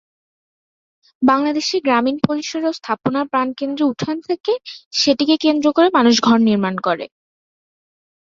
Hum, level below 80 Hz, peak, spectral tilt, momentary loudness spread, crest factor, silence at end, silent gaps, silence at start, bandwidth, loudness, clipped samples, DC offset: none; -60 dBFS; -2 dBFS; -4.5 dB/octave; 9 LU; 16 dB; 1.3 s; 4.40-4.44 s, 4.86-4.91 s; 1.2 s; 7.6 kHz; -17 LUFS; under 0.1%; under 0.1%